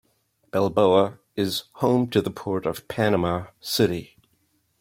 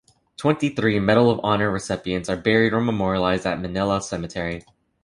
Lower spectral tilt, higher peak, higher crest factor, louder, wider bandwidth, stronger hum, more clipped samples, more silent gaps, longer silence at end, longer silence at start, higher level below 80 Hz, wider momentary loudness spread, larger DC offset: about the same, -5.5 dB/octave vs -6 dB/octave; about the same, -4 dBFS vs -4 dBFS; about the same, 20 dB vs 18 dB; about the same, -24 LUFS vs -22 LUFS; first, 16.5 kHz vs 11.5 kHz; neither; neither; neither; first, 0.75 s vs 0.45 s; first, 0.55 s vs 0.4 s; second, -58 dBFS vs -46 dBFS; about the same, 10 LU vs 10 LU; neither